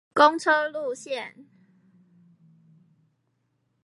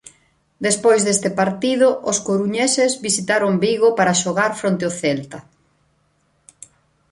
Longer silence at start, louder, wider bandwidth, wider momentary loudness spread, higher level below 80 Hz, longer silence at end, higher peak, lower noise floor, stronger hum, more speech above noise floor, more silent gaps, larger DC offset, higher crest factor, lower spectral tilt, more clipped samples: second, 0.15 s vs 0.6 s; second, -23 LUFS vs -18 LUFS; about the same, 11.5 kHz vs 11.5 kHz; first, 15 LU vs 7 LU; second, -80 dBFS vs -60 dBFS; first, 2.45 s vs 1.7 s; about the same, -4 dBFS vs -4 dBFS; first, -73 dBFS vs -63 dBFS; neither; first, 50 dB vs 45 dB; neither; neither; first, 24 dB vs 16 dB; about the same, -3 dB/octave vs -3.5 dB/octave; neither